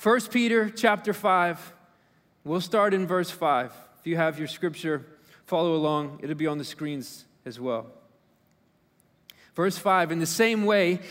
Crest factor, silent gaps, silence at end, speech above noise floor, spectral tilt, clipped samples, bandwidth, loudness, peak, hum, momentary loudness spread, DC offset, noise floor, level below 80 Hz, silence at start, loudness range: 20 dB; none; 0 s; 40 dB; -5 dB/octave; under 0.1%; 16 kHz; -26 LUFS; -6 dBFS; none; 13 LU; under 0.1%; -65 dBFS; -74 dBFS; 0 s; 9 LU